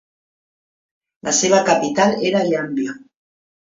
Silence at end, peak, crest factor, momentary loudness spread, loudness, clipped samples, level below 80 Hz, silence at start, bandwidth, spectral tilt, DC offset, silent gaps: 0.7 s; -2 dBFS; 18 dB; 13 LU; -17 LUFS; under 0.1%; -62 dBFS; 1.25 s; 7.8 kHz; -3.5 dB/octave; under 0.1%; none